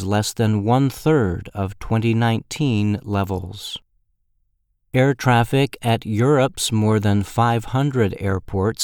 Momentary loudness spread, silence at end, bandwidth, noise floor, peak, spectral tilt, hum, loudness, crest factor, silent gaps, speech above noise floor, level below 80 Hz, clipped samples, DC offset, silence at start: 9 LU; 0 s; 18 kHz; -67 dBFS; -2 dBFS; -6 dB/octave; none; -20 LUFS; 18 dB; none; 48 dB; -44 dBFS; under 0.1%; under 0.1%; 0 s